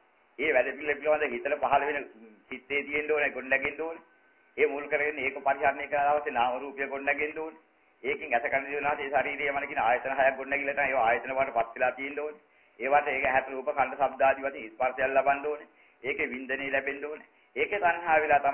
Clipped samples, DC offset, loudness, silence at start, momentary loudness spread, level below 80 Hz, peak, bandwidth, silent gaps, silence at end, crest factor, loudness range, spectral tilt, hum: under 0.1%; under 0.1%; -28 LUFS; 0.4 s; 11 LU; -64 dBFS; -10 dBFS; 3.3 kHz; none; 0 s; 20 dB; 2 LU; -7 dB/octave; none